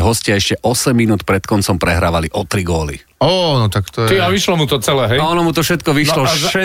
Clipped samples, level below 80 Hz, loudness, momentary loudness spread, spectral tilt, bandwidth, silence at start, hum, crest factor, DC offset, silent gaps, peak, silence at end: under 0.1%; -34 dBFS; -14 LUFS; 4 LU; -4.5 dB/octave; 16.5 kHz; 0 s; none; 12 dB; under 0.1%; none; -2 dBFS; 0 s